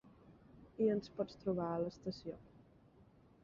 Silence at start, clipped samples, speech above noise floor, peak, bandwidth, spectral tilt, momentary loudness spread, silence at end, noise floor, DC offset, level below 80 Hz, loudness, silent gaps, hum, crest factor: 0.05 s; under 0.1%; 27 dB; -22 dBFS; 7.4 kHz; -7 dB/octave; 15 LU; 0.85 s; -66 dBFS; under 0.1%; -70 dBFS; -40 LUFS; none; none; 20 dB